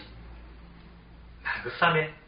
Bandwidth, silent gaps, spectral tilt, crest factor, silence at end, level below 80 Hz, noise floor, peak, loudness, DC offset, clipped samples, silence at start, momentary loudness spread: 5.2 kHz; none; -2.5 dB/octave; 24 dB; 0.1 s; -50 dBFS; -50 dBFS; -8 dBFS; -27 LUFS; under 0.1%; under 0.1%; 0 s; 26 LU